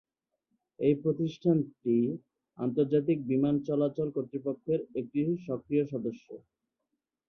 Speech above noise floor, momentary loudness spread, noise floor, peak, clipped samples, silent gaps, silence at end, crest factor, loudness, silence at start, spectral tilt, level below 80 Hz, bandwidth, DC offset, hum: 55 dB; 9 LU; -85 dBFS; -14 dBFS; under 0.1%; none; 0.9 s; 18 dB; -30 LUFS; 0.8 s; -10 dB/octave; -70 dBFS; 6.4 kHz; under 0.1%; none